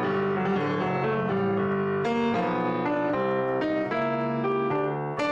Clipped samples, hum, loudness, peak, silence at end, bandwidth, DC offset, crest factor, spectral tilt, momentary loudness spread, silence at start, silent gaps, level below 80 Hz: under 0.1%; none; -26 LUFS; -14 dBFS; 0 s; 8 kHz; under 0.1%; 12 dB; -8 dB/octave; 1 LU; 0 s; none; -62 dBFS